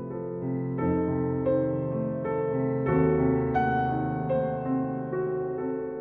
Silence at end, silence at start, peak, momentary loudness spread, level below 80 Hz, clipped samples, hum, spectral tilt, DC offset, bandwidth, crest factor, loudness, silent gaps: 0 s; 0 s; -12 dBFS; 7 LU; -50 dBFS; under 0.1%; none; -11.5 dB/octave; under 0.1%; 4 kHz; 16 dB; -28 LUFS; none